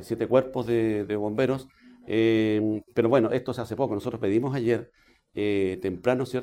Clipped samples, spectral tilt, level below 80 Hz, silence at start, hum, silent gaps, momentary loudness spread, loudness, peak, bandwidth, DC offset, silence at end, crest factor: under 0.1%; -7.5 dB/octave; -60 dBFS; 0 s; none; none; 7 LU; -26 LUFS; -6 dBFS; 14 kHz; under 0.1%; 0 s; 18 dB